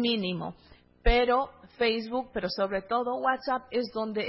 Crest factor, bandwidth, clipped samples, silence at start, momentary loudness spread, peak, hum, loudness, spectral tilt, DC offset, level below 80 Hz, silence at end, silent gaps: 18 dB; 5.8 kHz; under 0.1%; 0 s; 8 LU; -10 dBFS; none; -29 LUFS; -9 dB/octave; under 0.1%; -38 dBFS; 0 s; none